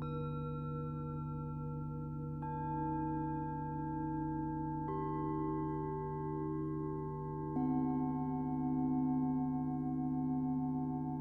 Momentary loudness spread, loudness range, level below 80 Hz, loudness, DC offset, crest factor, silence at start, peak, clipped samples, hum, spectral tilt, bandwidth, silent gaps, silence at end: 7 LU; 4 LU; -56 dBFS; -38 LUFS; under 0.1%; 12 dB; 0 s; -26 dBFS; under 0.1%; 50 Hz at -65 dBFS; -11.5 dB/octave; 4.1 kHz; none; 0 s